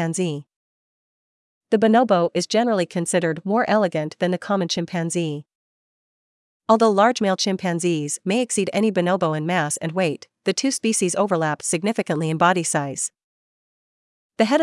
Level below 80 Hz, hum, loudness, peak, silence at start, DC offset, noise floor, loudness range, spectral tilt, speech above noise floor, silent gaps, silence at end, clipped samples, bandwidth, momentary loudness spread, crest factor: -72 dBFS; none; -21 LUFS; -4 dBFS; 0 s; under 0.1%; under -90 dBFS; 3 LU; -4.5 dB/octave; over 70 dB; 0.56-1.61 s, 5.55-6.60 s, 13.24-14.30 s; 0 s; under 0.1%; 12 kHz; 8 LU; 18 dB